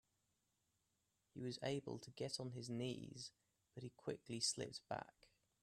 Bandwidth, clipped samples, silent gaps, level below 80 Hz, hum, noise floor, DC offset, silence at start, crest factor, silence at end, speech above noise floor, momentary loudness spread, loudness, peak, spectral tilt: 13.5 kHz; under 0.1%; none; -82 dBFS; none; -86 dBFS; under 0.1%; 1.35 s; 22 dB; 0.55 s; 38 dB; 15 LU; -48 LUFS; -28 dBFS; -4 dB/octave